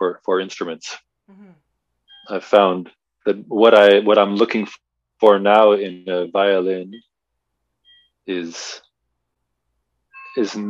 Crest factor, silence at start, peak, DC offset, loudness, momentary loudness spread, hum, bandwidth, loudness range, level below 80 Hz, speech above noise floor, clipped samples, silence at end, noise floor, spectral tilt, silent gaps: 18 dB; 0 s; 0 dBFS; under 0.1%; -17 LUFS; 19 LU; none; 7.8 kHz; 16 LU; -72 dBFS; 61 dB; under 0.1%; 0 s; -78 dBFS; -5 dB/octave; none